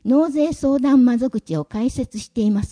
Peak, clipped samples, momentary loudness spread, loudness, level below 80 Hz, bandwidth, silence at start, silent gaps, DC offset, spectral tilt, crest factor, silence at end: -6 dBFS; under 0.1%; 11 LU; -19 LUFS; -42 dBFS; 10.5 kHz; 0.05 s; none; under 0.1%; -7 dB/octave; 12 dB; 0.05 s